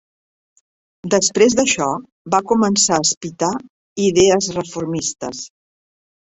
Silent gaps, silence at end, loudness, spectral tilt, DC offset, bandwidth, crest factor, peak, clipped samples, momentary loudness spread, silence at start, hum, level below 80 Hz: 2.12-2.25 s, 3.17-3.21 s, 3.70-3.96 s; 0.9 s; -17 LUFS; -3 dB/octave; under 0.1%; 8.4 kHz; 18 dB; -2 dBFS; under 0.1%; 15 LU; 1.05 s; none; -54 dBFS